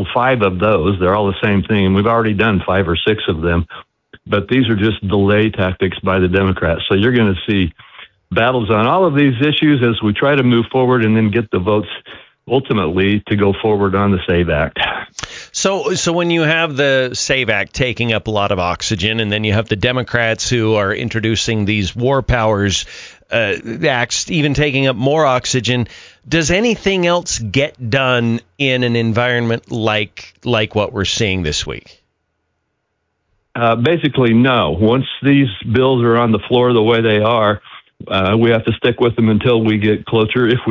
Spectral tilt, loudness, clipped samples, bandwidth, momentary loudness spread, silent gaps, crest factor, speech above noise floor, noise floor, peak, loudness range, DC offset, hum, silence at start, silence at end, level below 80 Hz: -5.5 dB/octave; -15 LUFS; under 0.1%; 7.6 kHz; 6 LU; none; 14 dB; 55 dB; -70 dBFS; -2 dBFS; 3 LU; under 0.1%; none; 0 s; 0 s; -34 dBFS